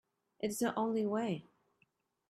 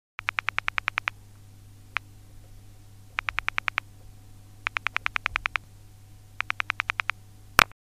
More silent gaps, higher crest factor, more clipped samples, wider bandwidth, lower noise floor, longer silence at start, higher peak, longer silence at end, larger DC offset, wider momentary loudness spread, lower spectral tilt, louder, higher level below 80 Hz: neither; second, 16 dB vs 32 dB; neither; about the same, 15 kHz vs 15.5 kHz; first, -77 dBFS vs -50 dBFS; first, 0.4 s vs 0.2 s; second, -22 dBFS vs 0 dBFS; first, 0.9 s vs 0.2 s; second, under 0.1% vs 0.2%; about the same, 7 LU vs 9 LU; first, -5 dB/octave vs -1.5 dB/octave; second, -36 LUFS vs -29 LUFS; second, -78 dBFS vs -50 dBFS